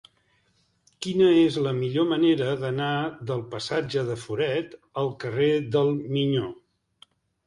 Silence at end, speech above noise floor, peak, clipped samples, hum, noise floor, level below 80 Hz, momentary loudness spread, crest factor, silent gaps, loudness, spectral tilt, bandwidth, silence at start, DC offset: 0.95 s; 43 dB; -8 dBFS; under 0.1%; none; -68 dBFS; -62 dBFS; 10 LU; 16 dB; none; -25 LUFS; -6.5 dB/octave; 11 kHz; 1 s; under 0.1%